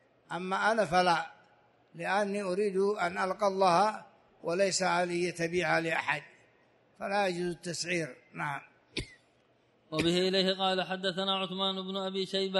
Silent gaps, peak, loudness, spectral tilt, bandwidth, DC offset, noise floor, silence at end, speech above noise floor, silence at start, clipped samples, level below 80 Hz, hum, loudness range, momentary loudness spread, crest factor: none; -12 dBFS; -31 LUFS; -4 dB/octave; 11.5 kHz; under 0.1%; -68 dBFS; 0 s; 37 dB; 0.3 s; under 0.1%; -64 dBFS; none; 6 LU; 13 LU; 18 dB